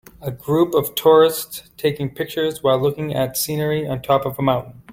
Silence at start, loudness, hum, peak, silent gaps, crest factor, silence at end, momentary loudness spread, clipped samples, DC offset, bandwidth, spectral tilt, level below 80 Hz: 0.2 s; -19 LUFS; none; -2 dBFS; none; 18 dB; 0 s; 11 LU; under 0.1%; under 0.1%; 17 kHz; -5 dB/octave; -52 dBFS